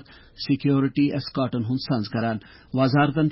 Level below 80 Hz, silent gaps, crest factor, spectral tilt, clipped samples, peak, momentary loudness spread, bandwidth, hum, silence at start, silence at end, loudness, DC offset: -54 dBFS; none; 14 dB; -11 dB/octave; under 0.1%; -10 dBFS; 9 LU; 5.8 kHz; none; 0.4 s; 0 s; -24 LUFS; under 0.1%